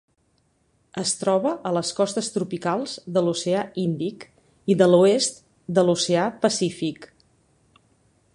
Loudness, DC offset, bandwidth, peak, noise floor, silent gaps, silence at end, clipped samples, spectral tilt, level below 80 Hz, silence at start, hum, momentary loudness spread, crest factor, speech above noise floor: -23 LUFS; under 0.1%; 11.5 kHz; -4 dBFS; -66 dBFS; none; 1.3 s; under 0.1%; -4.5 dB/octave; -66 dBFS; 0.95 s; none; 13 LU; 20 dB; 45 dB